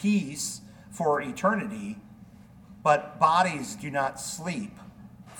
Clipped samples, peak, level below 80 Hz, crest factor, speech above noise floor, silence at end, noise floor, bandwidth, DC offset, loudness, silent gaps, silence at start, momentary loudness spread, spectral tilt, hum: under 0.1%; -8 dBFS; -62 dBFS; 22 dB; 23 dB; 0 s; -50 dBFS; 19 kHz; under 0.1%; -27 LUFS; none; 0 s; 18 LU; -4.5 dB/octave; none